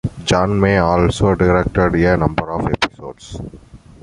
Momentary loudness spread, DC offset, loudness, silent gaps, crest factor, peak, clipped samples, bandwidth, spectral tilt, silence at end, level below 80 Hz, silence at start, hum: 17 LU; under 0.1%; -16 LUFS; none; 16 dB; -2 dBFS; under 0.1%; 11.5 kHz; -6.5 dB/octave; 0.25 s; -30 dBFS; 0.05 s; none